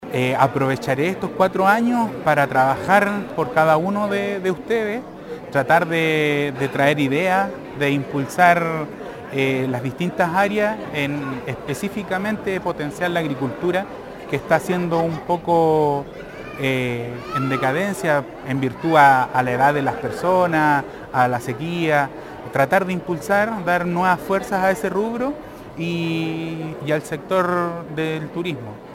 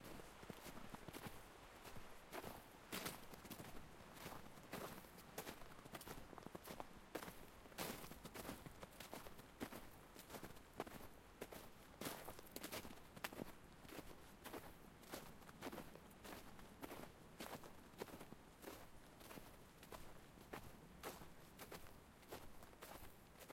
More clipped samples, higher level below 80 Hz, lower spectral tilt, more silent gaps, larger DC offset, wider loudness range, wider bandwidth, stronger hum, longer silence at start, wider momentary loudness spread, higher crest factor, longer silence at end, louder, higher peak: neither; first, -52 dBFS vs -68 dBFS; first, -6 dB/octave vs -3.5 dB/octave; neither; neither; about the same, 5 LU vs 4 LU; about the same, 17 kHz vs 16.5 kHz; neither; about the same, 0 s vs 0 s; about the same, 10 LU vs 9 LU; second, 20 dB vs 30 dB; about the same, 0 s vs 0 s; first, -20 LUFS vs -56 LUFS; first, 0 dBFS vs -26 dBFS